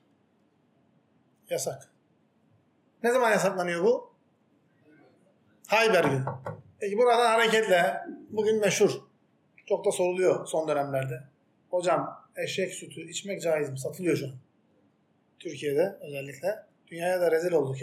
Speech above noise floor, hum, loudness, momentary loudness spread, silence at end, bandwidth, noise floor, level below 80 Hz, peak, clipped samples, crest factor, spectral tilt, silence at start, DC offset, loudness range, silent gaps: 42 dB; none; -27 LUFS; 16 LU; 0 s; 16 kHz; -68 dBFS; -82 dBFS; -10 dBFS; under 0.1%; 18 dB; -4.5 dB/octave; 1.5 s; under 0.1%; 8 LU; none